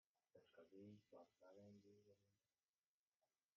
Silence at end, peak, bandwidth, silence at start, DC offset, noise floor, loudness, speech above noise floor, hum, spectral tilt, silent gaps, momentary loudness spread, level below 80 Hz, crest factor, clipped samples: 0.3 s; -54 dBFS; 6.8 kHz; 0.35 s; under 0.1%; under -90 dBFS; -67 LUFS; over 21 dB; none; -6.5 dB/octave; 2.68-3.12 s; 4 LU; under -90 dBFS; 16 dB; under 0.1%